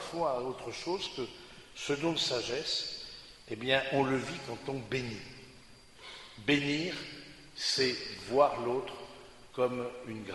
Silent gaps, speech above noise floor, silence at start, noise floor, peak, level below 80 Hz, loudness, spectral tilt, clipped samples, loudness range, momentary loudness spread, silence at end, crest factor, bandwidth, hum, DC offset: none; 22 dB; 0 s; -55 dBFS; -12 dBFS; -62 dBFS; -33 LUFS; -4 dB/octave; under 0.1%; 3 LU; 19 LU; 0 s; 24 dB; 11.5 kHz; none; under 0.1%